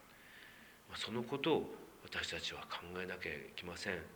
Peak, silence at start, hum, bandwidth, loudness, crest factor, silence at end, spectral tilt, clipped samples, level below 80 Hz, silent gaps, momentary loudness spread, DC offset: -22 dBFS; 0 s; none; over 20 kHz; -42 LUFS; 22 dB; 0 s; -4 dB/octave; under 0.1%; -70 dBFS; none; 20 LU; under 0.1%